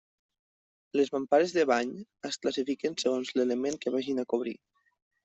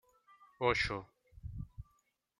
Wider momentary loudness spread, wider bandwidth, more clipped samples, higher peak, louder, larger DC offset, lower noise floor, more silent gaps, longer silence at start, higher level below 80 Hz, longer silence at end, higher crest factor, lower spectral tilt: second, 11 LU vs 23 LU; second, 8.2 kHz vs 10.5 kHz; neither; first, -12 dBFS vs -16 dBFS; first, -30 LUFS vs -36 LUFS; neither; first, under -90 dBFS vs -77 dBFS; neither; first, 0.95 s vs 0.4 s; second, -76 dBFS vs -54 dBFS; about the same, 0.7 s vs 0.6 s; second, 18 dB vs 24 dB; about the same, -4 dB/octave vs -5 dB/octave